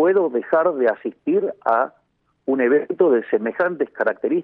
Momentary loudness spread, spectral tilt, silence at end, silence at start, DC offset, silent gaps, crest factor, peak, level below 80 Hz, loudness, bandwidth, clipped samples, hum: 6 LU; -9.5 dB/octave; 0 s; 0 s; under 0.1%; none; 16 dB; -4 dBFS; -72 dBFS; -20 LUFS; 4.2 kHz; under 0.1%; none